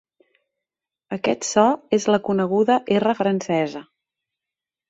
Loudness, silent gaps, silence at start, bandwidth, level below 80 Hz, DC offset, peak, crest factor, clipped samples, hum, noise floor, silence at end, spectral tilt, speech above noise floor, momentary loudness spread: -20 LUFS; none; 1.1 s; 8 kHz; -66 dBFS; under 0.1%; -2 dBFS; 20 dB; under 0.1%; none; -88 dBFS; 1.05 s; -5 dB/octave; 68 dB; 8 LU